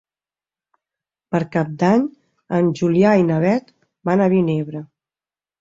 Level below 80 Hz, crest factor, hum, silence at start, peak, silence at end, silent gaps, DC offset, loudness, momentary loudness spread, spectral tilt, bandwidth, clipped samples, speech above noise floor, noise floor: -58 dBFS; 18 dB; none; 1.3 s; -2 dBFS; 0.75 s; none; under 0.1%; -18 LUFS; 12 LU; -8.5 dB/octave; 7.6 kHz; under 0.1%; over 73 dB; under -90 dBFS